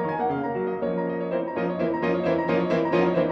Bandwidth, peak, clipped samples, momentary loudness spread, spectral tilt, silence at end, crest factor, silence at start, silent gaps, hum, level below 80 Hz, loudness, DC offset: 6.4 kHz; -8 dBFS; under 0.1%; 6 LU; -8.5 dB/octave; 0 s; 16 dB; 0 s; none; none; -58 dBFS; -25 LUFS; under 0.1%